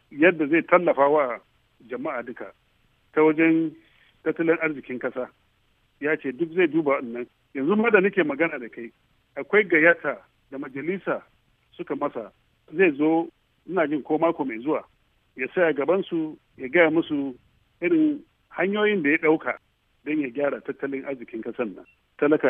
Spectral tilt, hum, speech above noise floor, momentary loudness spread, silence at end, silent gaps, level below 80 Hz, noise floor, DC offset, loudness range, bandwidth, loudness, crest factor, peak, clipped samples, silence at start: -9 dB/octave; none; 42 dB; 17 LU; 0 s; none; -70 dBFS; -65 dBFS; under 0.1%; 4 LU; 3.7 kHz; -24 LUFS; 22 dB; -2 dBFS; under 0.1%; 0.1 s